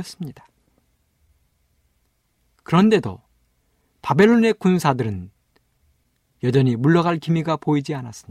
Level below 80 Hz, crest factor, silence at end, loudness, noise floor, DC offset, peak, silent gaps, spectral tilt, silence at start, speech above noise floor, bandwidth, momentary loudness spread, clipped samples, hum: -58 dBFS; 18 dB; 0.1 s; -19 LUFS; -67 dBFS; under 0.1%; -4 dBFS; none; -7 dB/octave; 0 s; 48 dB; 13.5 kHz; 18 LU; under 0.1%; none